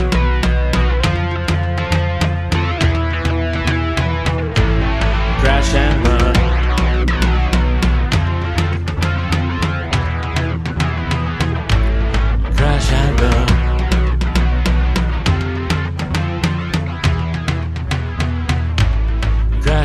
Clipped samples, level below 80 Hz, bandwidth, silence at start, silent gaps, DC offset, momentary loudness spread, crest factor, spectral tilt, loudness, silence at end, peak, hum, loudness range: under 0.1%; -18 dBFS; 12.5 kHz; 0 s; none; 0.4%; 5 LU; 14 dB; -6 dB/octave; -17 LUFS; 0 s; 0 dBFS; none; 4 LU